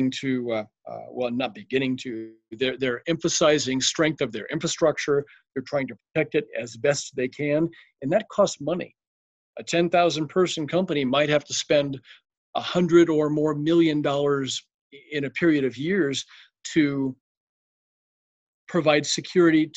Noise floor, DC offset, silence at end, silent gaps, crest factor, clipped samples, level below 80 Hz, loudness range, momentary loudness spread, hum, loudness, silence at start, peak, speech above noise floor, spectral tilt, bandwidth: under -90 dBFS; under 0.1%; 0.1 s; 9.07-9.53 s, 12.37-12.53 s, 14.74-14.90 s, 17.21-18.67 s; 18 dB; under 0.1%; -64 dBFS; 4 LU; 12 LU; none; -24 LUFS; 0 s; -6 dBFS; over 66 dB; -4.5 dB/octave; 8.8 kHz